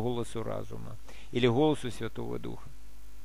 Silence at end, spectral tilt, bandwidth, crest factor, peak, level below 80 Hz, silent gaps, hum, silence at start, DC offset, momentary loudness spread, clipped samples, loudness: 0 s; -6.5 dB/octave; 15.5 kHz; 20 dB; -12 dBFS; -52 dBFS; none; none; 0 s; 2%; 20 LU; under 0.1%; -32 LUFS